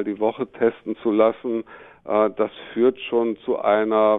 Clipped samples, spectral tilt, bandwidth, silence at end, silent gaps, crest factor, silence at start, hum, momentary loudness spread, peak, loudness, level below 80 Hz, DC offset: under 0.1%; -9 dB/octave; 4 kHz; 0 s; none; 16 dB; 0 s; none; 9 LU; -4 dBFS; -22 LUFS; -66 dBFS; under 0.1%